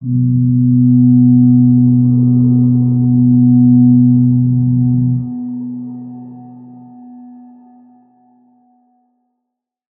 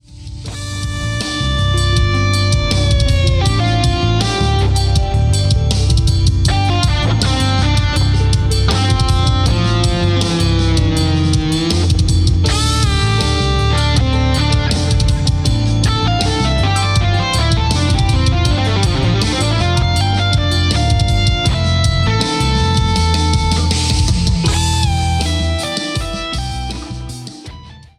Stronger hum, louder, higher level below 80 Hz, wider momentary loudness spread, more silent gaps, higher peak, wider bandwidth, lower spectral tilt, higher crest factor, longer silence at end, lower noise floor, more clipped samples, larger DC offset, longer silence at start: neither; first, -11 LUFS vs -15 LUFS; second, -46 dBFS vs -20 dBFS; first, 15 LU vs 5 LU; neither; about the same, -2 dBFS vs 0 dBFS; second, 1.2 kHz vs 13 kHz; first, -18.5 dB/octave vs -5 dB/octave; about the same, 12 dB vs 12 dB; first, 2.7 s vs 0.2 s; first, -77 dBFS vs -34 dBFS; neither; neither; about the same, 0 s vs 0.1 s